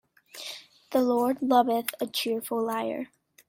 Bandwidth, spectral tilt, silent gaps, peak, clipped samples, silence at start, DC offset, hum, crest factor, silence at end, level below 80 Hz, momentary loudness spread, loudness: 16.5 kHz; -3.5 dB/octave; none; -8 dBFS; under 0.1%; 0.35 s; under 0.1%; none; 20 dB; 0.45 s; -74 dBFS; 17 LU; -27 LUFS